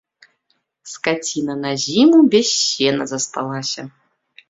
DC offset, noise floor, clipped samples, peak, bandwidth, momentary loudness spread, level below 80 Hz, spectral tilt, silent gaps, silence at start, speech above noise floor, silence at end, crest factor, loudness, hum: under 0.1%; -68 dBFS; under 0.1%; -2 dBFS; 8 kHz; 13 LU; -62 dBFS; -3.5 dB/octave; none; 0.85 s; 51 dB; 0.6 s; 18 dB; -17 LUFS; none